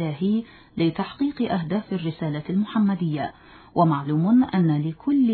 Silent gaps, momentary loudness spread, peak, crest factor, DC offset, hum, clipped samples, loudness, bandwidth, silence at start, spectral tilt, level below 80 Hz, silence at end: none; 10 LU; -6 dBFS; 16 dB; under 0.1%; none; under 0.1%; -24 LUFS; 4.5 kHz; 0 s; -11.5 dB/octave; -58 dBFS; 0 s